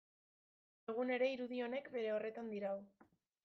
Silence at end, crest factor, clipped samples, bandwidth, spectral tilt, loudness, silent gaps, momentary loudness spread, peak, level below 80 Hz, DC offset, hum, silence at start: 0.55 s; 18 dB; under 0.1%; 6.4 kHz; -6.5 dB/octave; -42 LUFS; none; 9 LU; -26 dBFS; -90 dBFS; under 0.1%; none; 0.9 s